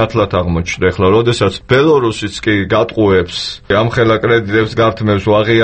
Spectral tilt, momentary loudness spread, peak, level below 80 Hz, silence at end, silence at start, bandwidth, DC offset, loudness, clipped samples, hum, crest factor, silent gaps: -6 dB/octave; 5 LU; 0 dBFS; -36 dBFS; 0 s; 0 s; 8.8 kHz; under 0.1%; -13 LUFS; under 0.1%; none; 12 dB; none